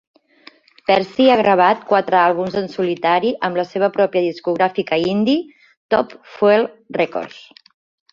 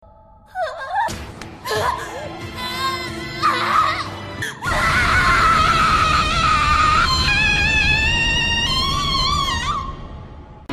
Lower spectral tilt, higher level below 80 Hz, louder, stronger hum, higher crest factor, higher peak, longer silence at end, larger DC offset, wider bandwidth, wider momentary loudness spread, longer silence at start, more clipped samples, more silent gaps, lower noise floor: first, -6.5 dB/octave vs -3 dB/octave; second, -60 dBFS vs -30 dBFS; about the same, -17 LUFS vs -17 LUFS; neither; about the same, 18 dB vs 16 dB; first, 0 dBFS vs -4 dBFS; first, 0.7 s vs 0 s; neither; second, 7.4 kHz vs 14.5 kHz; second, 8 LU vs 15 LU; first, 0.9 s vs 0.55 s; neither; first, 5.77-5.89 s vs none; about the same, -48 dBFS vs -46 dBFS